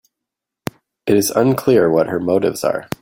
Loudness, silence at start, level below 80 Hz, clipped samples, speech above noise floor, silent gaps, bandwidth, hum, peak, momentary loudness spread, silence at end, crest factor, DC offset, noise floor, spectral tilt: -16 LUFS; 1.05 s; -54 dBFS; under 0.1%; 67 dB; none; 16.5 kHz; none; 0 dBFS; 17 LU; 0.15 s; 16 dB; under 0.1%; -83 dBFS; -5.5 dB/octave